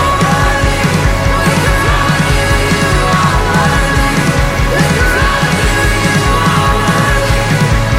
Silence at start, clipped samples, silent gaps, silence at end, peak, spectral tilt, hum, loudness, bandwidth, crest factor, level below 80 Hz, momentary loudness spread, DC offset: 0 s; under 0.1%; none; 0 s; 0 dBFS; -4.5 dB/octave; none; -11 LUFS; 16.5 kHz; 10 dB; -18 dBFS; 1 LU; under 0.1%